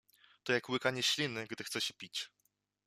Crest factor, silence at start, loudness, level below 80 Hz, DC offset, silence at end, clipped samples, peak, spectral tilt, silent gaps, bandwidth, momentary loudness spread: 22 dB; 0.45 s; -35 LUFS; -80 dBFS; under 0.1%; 0.6 s; under 0.1%; -16 dBFS; -2.5 dB/octave; none; 15 kHz; 10 LU